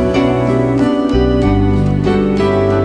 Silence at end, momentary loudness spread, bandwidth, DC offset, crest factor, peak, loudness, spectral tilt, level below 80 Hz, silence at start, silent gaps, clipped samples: 0 s; 1 LU; 10 kHz; under 0.1%; 12 dB; 0 dBFS; -13 LUFS; -8 dB/octave; -24 dBFS; 0 s; none; under 0.1%